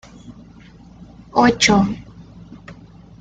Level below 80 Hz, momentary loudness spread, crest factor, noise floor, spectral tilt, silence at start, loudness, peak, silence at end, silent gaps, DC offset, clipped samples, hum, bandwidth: -44 dBFS; 27 LU; 20 dB; -43 dBFS; -4 dB/octave; 0.25 s; -16 LUFS; 0 dBFS; 0.45 s; none; under 0.1%; under 0.1%; none; 9.2 kHz